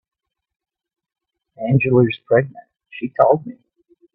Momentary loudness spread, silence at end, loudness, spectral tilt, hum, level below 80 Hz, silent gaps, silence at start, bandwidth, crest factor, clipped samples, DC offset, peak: 16 LU; 0.65 s; -17 LUFS; -11 dB/octave; none; -60 dBFS; none; 1.6 s; 4.1 kHz; 20 dB; under 0.1%; under 0.1%; 0 dBFS